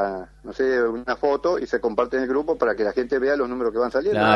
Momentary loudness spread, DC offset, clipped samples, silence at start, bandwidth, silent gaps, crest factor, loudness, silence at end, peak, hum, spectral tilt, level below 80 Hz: 3 LU; under 0.1%; under 0.1%; 0 s; 7.2 kHz; none; 20 dB; -23 LUFS; 0 s; -2 dBFS; none; -6 dB/octave; -50 dBFS